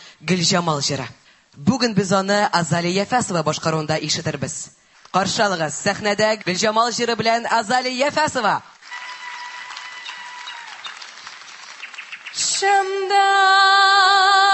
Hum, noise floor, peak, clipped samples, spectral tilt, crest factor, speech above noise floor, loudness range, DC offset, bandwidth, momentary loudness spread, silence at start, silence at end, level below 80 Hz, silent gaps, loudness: none; -39 dBFS; -2 dBFS; under 0.1%; -3 dB/octave; 18 dB; 20 dB; 11 LU; under 0.1%; 8.6 kHz; 20 LU; 0 s; 0 s; -58 dBFS; none; -18 LUFS